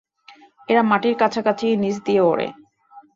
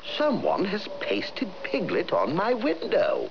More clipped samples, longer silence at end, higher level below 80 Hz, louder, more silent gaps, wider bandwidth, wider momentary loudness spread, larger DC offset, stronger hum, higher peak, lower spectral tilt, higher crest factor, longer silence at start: neither; first, 0.15 s vs 0 s; about the same, -64 dBFS vs -66 dBFS; first, -19 LUFS vs -26 LUFS; neither; first, 7.6 kHz vs 5.4 kHz; about the same, 4 LU vs 5 LU; second, under 0.1% vs 0.8%; neither; first, -2 dBFS vs -12 dBFS; about the same, -6 dB/octave vs -6.5 dB/octave; about the same, 18 dB vs 14 dB; first, 0.7 s vs 0 s